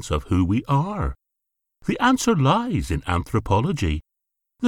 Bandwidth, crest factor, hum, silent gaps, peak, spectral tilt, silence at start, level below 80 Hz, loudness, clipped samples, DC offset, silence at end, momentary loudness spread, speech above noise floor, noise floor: 17.5 kHz; 18 dB; none; none; -4 dBFS; -6 dB/octave; 0 s; -36 dBFS; -22 LUFS; under 0.1%; under 0.1%; 0 s; 10 LU; 60 dB; -81 dBFS